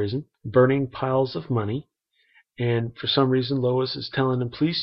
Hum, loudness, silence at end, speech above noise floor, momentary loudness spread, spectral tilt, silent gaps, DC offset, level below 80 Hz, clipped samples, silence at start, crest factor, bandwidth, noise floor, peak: none; -24 LUFS; 0 s; 38 dB; 9 LU; -10 dB/octave; none; under 0.1%; -60 dBFS; under 0.1%; 0 s; 18 dB; 5.8 kHz; -62 dBFS; -6 dBFS